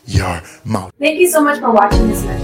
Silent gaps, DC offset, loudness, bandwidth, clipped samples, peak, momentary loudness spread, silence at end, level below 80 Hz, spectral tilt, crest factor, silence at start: none; under 0.1%; -14 LUFS; 16.5 kHz; under 0.1%; 0 dBFS; 11 LU; 0 s; -24 dBFS; -5 dB/octave; 14 dB; 0.05 s